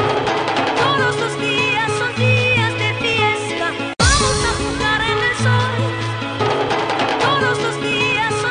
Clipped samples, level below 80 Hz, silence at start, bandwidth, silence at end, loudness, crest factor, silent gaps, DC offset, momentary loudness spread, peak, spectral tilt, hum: under 0.1%; -34 dBFS; 0 s; 10.5 kHz; 0 s; -17 LUFS; 16 dB; none; under 0.1%; 5 LU; 0 dBFS; -4 dB/octave; none